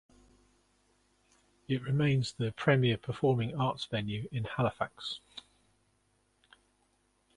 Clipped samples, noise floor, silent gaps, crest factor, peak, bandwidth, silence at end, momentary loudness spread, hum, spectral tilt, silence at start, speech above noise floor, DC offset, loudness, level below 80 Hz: under 0.1%; -73 dBFS; none; 24 dB; -10 dBFS; 11 kHz; 1.95 s; 12 LU; 50 Hz at -65 dBFS; -7 dB/octave; 1.7 s; 42 dB; under 0.1%; -32 LUFS; -62 dBFS